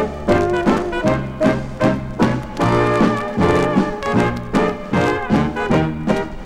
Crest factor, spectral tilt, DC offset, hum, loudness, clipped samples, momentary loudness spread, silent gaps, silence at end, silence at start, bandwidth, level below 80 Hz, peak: 16 dB; -7 dB/octave; under 0.1%; none; -18 LUFS; under 0.1%; 3 LU; none; 0 s; 0 s; 13.5 kHz; -34 dBFS; 0 dBFS